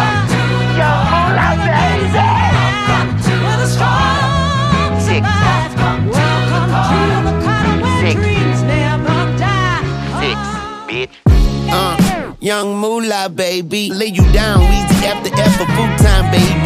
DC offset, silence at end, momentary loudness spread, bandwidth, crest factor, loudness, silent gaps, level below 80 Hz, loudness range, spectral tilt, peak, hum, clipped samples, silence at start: under 0.1%; 0 s; 6 LU; 15.5 kHz; 12 dB; -13 LUFS; none; -22 dBFS; 3 LU; -5.5 dB/octave; 0 dBFS; none; under 0.1%; 0 s